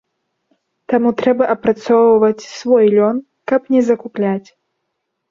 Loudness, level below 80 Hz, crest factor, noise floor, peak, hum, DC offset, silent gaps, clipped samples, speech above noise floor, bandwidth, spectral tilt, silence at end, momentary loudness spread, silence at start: -15 LUFS; -58 dBFS; 14 dB; -73 dBFS; -2 dBFS; none; under 0.1%; none; under 0.1%; 60 dB; 7.4 kHz; -6.5 dB/octave; 0.9 s; 8 LU; 0.9 s